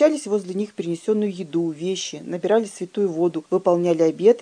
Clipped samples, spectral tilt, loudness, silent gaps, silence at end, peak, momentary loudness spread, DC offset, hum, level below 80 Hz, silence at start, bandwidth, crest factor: under 0.1%; -5.5 dB/octave; -22 LUFS; none; 0 s; -4 dBFS; 9 LU; under 0.1%; none; -76 dBFS; 0 s; 10 kHz; 16 dB